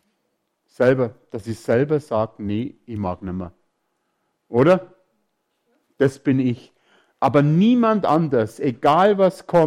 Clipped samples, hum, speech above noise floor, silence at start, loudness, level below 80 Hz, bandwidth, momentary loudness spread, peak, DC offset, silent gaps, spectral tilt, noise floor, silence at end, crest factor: under 0.1%; none; 54 dB; 0.8 s; -20 LUFS; -58 dBFS; 13 kHz; 14 LU; -6 dBFS; under 0.1%; none; -8 dB/octave; -72 dBFS; 0 s; 14 dB